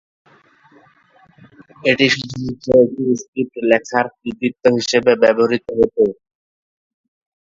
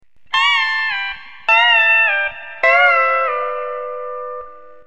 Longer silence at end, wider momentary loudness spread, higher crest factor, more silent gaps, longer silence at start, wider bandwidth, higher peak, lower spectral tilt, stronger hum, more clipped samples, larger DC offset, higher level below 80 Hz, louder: first, 1.35 s vs 0.25 s; second, 9 LU vs 16 LU; about the same, 18 dB vs 16 dB; first, 3.28-3.33 s vs none; first, 1.85 s vs 0.3 s; second, 7.8 kHz vs 9 kHz; about the same, 0 dBFS vs 0 dBFS; first, -4.5 dB/octave vs 0.5 dB/octave; neither; neither; second, under 0.1% vs 1%; about the same, -54 dBFS vs -58 dBFS; second, -17 LUFS vs -14 LUFS